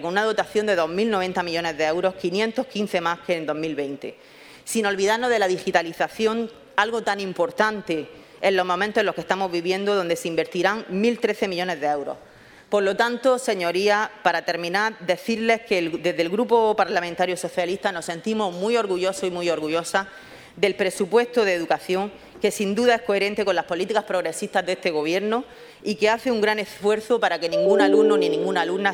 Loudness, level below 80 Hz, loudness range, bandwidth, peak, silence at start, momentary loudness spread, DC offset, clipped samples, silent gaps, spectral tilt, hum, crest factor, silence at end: -23 LUFS; -64 dBFS; 2 LU; 17.5 kHz; -2 dBFS; 0 s; 7 LU; under 0.1%; under 0.1%; none; -4 dB/octave; none; 20 dB; 0 s